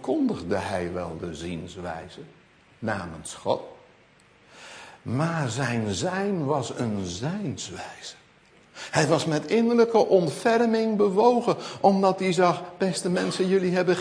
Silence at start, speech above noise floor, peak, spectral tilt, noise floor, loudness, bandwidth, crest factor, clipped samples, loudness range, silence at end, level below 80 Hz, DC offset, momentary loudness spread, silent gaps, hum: 0 s; 33 dB; -6 dBFS; -5.5 dB/octave; -57 dBFS; -25 LUFS; 10.5 kHz; 20 dB; under 0.1%; 12 LU; 0 s; -60 dBFS; under 0.1%; 17 LU; none; none